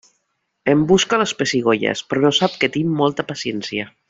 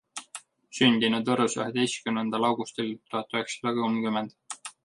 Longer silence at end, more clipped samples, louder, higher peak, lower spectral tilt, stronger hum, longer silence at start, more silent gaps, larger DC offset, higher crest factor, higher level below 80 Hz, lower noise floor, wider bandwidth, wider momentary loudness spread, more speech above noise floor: about the same, 0.2 s vs 0.15 s; neither; first, -18 LUFS vs -27 LUFS; first, -2 dBFS vs -6 dBFS; about the same, -4.5 dB/octave vs -4 dB/octave; neither; first, 0.65 s vs 0.15 s; neither; neither; second, 16 dB vs 22 dB; first, -54 dBFS vs -70 dBFS; first, -71 dBFS vs -48 dBFS; second, 8 kHz vs 11.5 kHz; second, 10 LU vs 17 LU; first, 53 dB vs 21 dB